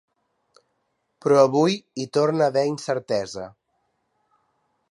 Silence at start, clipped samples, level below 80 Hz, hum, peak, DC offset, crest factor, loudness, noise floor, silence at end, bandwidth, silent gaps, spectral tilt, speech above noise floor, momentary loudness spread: 1.25 s; under 0.1%; -68 dBFS; none; -2 dBFS; under 0.1%; 22 dB; -22 LUFS; -73 dBFS; 1.45 s; 11.5 kHz; none; -5.5 dB/octave; 52 dB; 14 LU